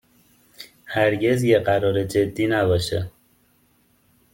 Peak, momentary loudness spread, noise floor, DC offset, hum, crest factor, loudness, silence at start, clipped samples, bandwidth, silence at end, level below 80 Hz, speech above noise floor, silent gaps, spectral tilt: -4 dBFS; 19 LU; -61 dBFS; under 0.1%; none; 18 dB; -21 LUFS; 0.6 s; under 0.1%; 17 kHz; 1.25 s; -54 dBFS; 42 dB; none; -6 dB/octave